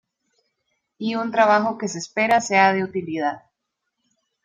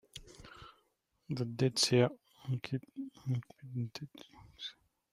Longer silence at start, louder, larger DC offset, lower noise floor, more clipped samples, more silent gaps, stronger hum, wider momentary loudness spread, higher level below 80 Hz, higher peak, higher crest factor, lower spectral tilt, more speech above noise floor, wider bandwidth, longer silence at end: first, 1 s vs 0.15 s; first, -20 LUFS vs -36 LUFS; neither; about the same, -79 dBFS vs -77 dBFS; neither; neither; neither; second, 11 LU vs 25 LU; about the same, -68 dBFS vs -68 dBFS; first, -4 dBFS vs -16 dBFS; about the same, 18 dB vs 22 dB; about the same, -4.5 dB/octave vs -5 dB/octave; first, 59 dB vs 43 dB; second, 12 kHz vs 14.5 kHz; first, 1.05 s vs 0.4 s